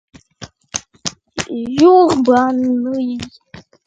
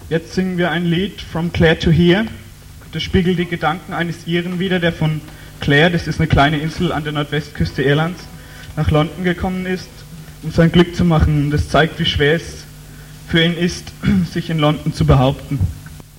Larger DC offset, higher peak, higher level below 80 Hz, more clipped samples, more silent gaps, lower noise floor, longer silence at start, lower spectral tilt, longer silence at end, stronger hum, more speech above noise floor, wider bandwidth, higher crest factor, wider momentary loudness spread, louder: neither; about the same, 0 dBFS vs -2 dBFS; second, -50 dBFS vs -32 dBFS; neither; neither; about the same, -39 dBFS vs -37 dBFS; first, 0.4 s vs 0 s; second, -4.5 dB/octave vs -6.5 dB/octave; about the same, 0.25 s vs 0.15 s; neither; first, 26 dB vs 21 dB; second, 9.2 kHz vs 16.5 kHz; about the same, 16 dB vs 16 dB; about the same, 17 LU vs 16 LU; about the same, -15 LUFS vs -17 LUFS